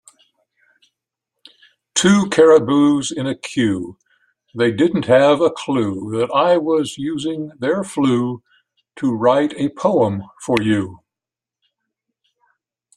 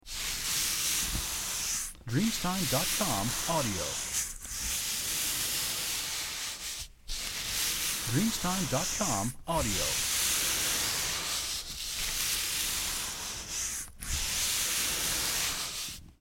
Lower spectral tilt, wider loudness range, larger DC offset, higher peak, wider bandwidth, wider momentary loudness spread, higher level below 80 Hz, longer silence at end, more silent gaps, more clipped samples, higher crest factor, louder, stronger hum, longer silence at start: first, -5 dB/octave vs -1.5 dB/octave; about the same, 4 LU vs 3 LU; neither; first, 0 dBFS vs -14 dBFS; second, 12 kHz vs 17 kHz; first, 12 LU vs 7 LU; second, -58 dBFS vs -46 dBFS; first, 2 s vs 0.1 s; neither; neither; about the same, 18 dB vs 18 dB; first, -17 LUFS vs -30 LUFS; neither; first, 1.95 s vs 0.05 s